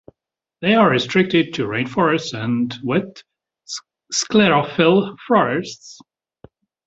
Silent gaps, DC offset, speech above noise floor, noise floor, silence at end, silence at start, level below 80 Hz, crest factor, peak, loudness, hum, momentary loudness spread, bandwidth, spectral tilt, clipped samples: none; under 0.1%; 58 dB; -76 dBFS; 0.9 s; 0.6 s; -58 dBFS; 18 dB; -2 dBFS; -18 LUFS; none; 17 LU; 8 kHz; -5 dB/octave; under 0.1%